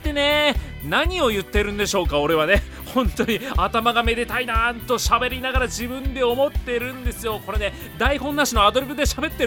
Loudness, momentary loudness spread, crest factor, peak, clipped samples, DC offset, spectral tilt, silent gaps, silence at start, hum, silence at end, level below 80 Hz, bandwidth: -21 LUFS; 8 LU; 18 dB; -2 dBFS; under 0.1%; under 0.1%; -4 dB/octave; none; 0 s; none; 0 s; -30 dBFS; 18.5 kHz